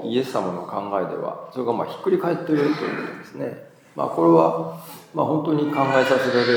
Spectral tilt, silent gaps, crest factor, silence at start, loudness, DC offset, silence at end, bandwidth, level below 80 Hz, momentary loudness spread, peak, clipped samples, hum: -6.5 dB/octave; none; 20 dB; 0 s; -22 LUFS; under 0.1%; 0 s; 19.5 kHz; -74 dBFS; 14 LU; -2 dBFS; under 0.1%; none